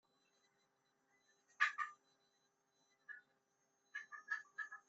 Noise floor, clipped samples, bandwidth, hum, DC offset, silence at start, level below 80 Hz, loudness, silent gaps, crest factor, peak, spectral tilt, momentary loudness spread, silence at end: -83 dBFS; under 0.1%; 7.6 kHz; none; under 0.1%; 1.6 s; under -90 dBFS; -44 LUFS; none; 30 dB; -20 dBFS; 5 dB/octave; 19 LU; 0.1 s